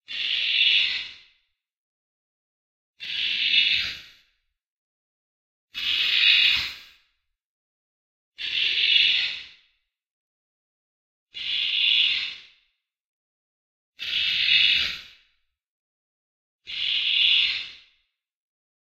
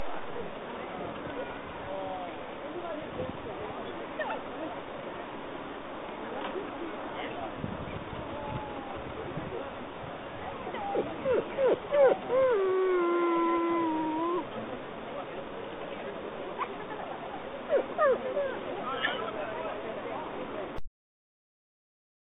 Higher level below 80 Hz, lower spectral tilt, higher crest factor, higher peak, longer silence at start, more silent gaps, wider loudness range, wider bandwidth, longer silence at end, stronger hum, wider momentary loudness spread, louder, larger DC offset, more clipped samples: about the same, -62 dBFS vs -58 dBFS; second, 1 dB/octave vs -4 dB/octave; about the same, 24 dB vs 20 dB; first, -4 dBFS vs -12 dBFS; about the same, 0.1 s vs 0 s; first, 1.77-2.94 s, 4.66-5.68 s, 7.44-8.32 s, 10.07-11.27 s, 13.01-13.93 s, 15.67-16.59 s vs none; second, 4 LU vs 11 LU; first, 16 kHz vs 4 kHz; second, 1.2 s vs 1.35 s; neither; first, 18 LU vs 13 LU; first, -20 LUFS vs -33 LUFS; neither; neither